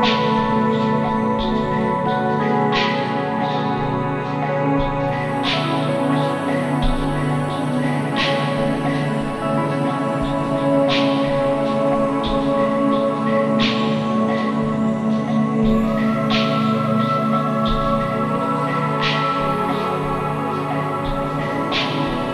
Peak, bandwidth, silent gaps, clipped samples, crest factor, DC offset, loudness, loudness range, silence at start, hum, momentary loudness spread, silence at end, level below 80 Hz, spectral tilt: -4 dBFS; 12 kHz; none; under 0.1%; 14 dB; under 0.1%; -19 LUFS; 2 LU; 0 s; none; 4 LU; 0 s; -36 dBFS; -6.5 dB/octave